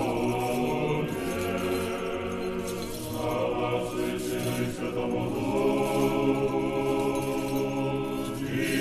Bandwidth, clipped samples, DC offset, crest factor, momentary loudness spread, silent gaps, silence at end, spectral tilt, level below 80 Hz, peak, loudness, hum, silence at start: 13.5 kHz; under 0.1%; under 0.1%; 14 dB; 6 LU; none; 0 s; -5.5 dB/octave; -48 dBFS; -14 dBFS; -29 LUFS; none; 0 s